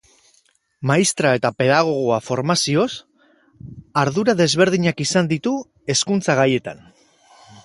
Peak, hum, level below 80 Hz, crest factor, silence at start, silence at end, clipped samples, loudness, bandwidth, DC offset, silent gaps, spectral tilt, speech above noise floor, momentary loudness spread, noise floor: -2 dBFS; none; -58 dBFS; 18 dB; 0.8 s; 0.9 s; under 0.1%; -19 LUFS; 11.5 kHz; under 0.1%; none; -4.5 dB/octave; 43 dB; 8 LU; -61 dBFS